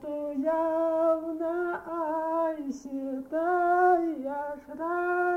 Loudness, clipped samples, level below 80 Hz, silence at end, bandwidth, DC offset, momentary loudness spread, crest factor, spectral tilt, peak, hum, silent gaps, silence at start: -29 LUFS; under 0.1%; -66 dBFS; 0 s; 8.2 kHz; under 0.1%; 12 LU; 16 dB; -6 dB/octave; -12 dBFS; none; none; 0 s